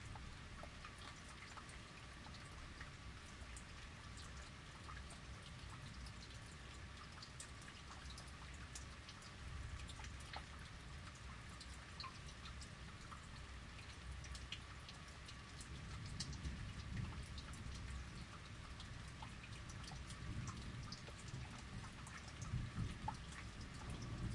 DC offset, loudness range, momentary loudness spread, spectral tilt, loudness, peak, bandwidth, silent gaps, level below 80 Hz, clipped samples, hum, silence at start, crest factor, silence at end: under 0.1%; 4 LU; 6 LU; -4 dB/octave; -53 LUFS; -32 dBFS; 11.5 kHz; none; -58 dBFS; under 0.1%; none; 0 s; 20 dB; 0 s